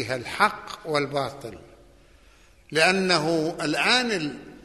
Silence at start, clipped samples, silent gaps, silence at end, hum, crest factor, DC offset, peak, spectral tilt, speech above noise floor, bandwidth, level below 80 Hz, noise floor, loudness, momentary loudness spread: 0 s; under 0.1%; none; 0.05 s; none; 22 dB; under 0.1%; -4 dBFS; -3.5 dB/octave; 30 dB; 12.5 kHz; -58 dBFS; -55 dBFS; -23 LUFS; 13 LU